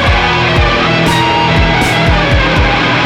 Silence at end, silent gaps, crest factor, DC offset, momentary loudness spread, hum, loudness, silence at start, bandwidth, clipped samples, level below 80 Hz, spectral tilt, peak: 0 s; none; 10 dB; under 0.1%; 0 LU; none; -10 LUFS; 0 s; 18 kHz; under 0.1%; -18 dBFS; -5 dB/octave; 0 dBFS